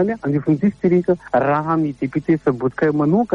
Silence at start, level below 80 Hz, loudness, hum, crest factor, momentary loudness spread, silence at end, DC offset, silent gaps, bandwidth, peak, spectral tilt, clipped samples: 0 s; -52 dBFS; -18 LUFS; none; 14 dB; 4 LU; 0 s; under 0.1%; none; 7.2 kHz; -4 dBFS; -10 dB/octave; under 0.1%